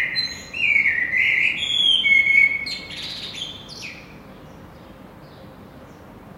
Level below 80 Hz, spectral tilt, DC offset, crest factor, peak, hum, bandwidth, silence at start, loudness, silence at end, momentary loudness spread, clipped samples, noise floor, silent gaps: -54 dBFS; -1 dB/octave; under 0.1%; 18 dB; -6 dBFS; none; 16 kHz; 0 s; -17 LUFS; 0 s; 20 LU; under 0.1%; -42 dBFS; none